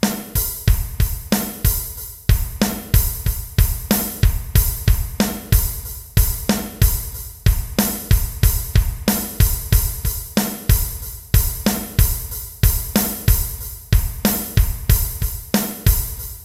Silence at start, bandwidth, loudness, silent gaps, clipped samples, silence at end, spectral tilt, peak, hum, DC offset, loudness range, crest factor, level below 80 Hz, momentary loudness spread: 0 s; 16.5 kHz; -20 LUFS; none; under 0.1%; 0 s; -4.5 dB/octave; 0 dBFS; none; under 0.1%; 1 LU; 18 dB; -22 dBFS; 6 LU